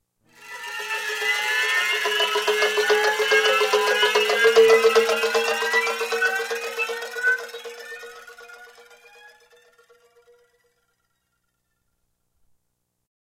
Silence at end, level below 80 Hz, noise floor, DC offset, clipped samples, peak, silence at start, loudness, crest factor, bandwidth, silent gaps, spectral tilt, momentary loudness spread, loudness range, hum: 4.7 s; -72 dBFS; -76 dBFS; under 0.1%; under 0.1%; -4 dBFS; 0.4 s; -20 LUFS; 18 dB; 16.5 kHz; none; 0.5 dB/octave; 19 LU; 12 LU; 60 Hz at -80 dBFS